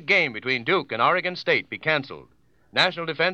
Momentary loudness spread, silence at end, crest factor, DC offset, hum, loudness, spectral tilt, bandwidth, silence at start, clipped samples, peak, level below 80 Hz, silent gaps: 6 LU; 0 s; 20 dB; under 0.1%; none; -23 LUFS; -4.5 dB/octave; 9 kHz; 0 s; under 0.1%; -4 dBFS; -68 dBFS; none